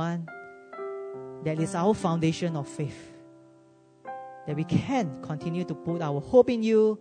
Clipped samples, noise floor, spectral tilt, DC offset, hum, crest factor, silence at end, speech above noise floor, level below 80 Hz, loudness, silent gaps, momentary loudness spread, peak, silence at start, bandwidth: under 0.1%; -57 dBFS; -7 dB/octave; under 0.1%; none; 20 dB; 0 s; 31 dB; -60 dBFS; -27 LUFS; none; 19 LU; -6 dBFS; 0 s; 9.6 kHz